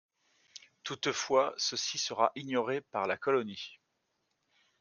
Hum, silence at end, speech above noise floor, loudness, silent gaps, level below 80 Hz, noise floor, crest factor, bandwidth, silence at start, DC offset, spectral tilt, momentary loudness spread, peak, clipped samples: none; 1.05 s; 48 dB; -32 LUFS; none; -80 dBFS; -80 dBFS; 24 dB; 10.5 kHz; 0.85 s; under 0.1%; -2.5 dB/octave; 16 LU; -10 dBFS; under 0.1%